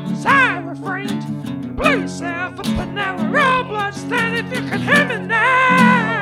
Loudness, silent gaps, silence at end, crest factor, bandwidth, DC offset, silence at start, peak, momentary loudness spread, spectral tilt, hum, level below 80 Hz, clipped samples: -17 LUFS; none; 0 s; 18 dB; 16 kHz; under 0.1%; 0 s; 0 dBFS; 12 LU; -5 dB/octave; none; -44 dBFS; under 0.1%